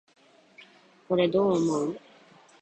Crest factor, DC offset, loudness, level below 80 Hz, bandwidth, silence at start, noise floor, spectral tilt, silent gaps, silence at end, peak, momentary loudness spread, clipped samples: 18 dB; under 0.1%; -26 LUFS; -68 dBFS; 9 kHz; 1.1 s; -56 dBFS; -6.5 dB/octave; none; 0.65 s; -12 dBFS; 10 LU; under 0.1%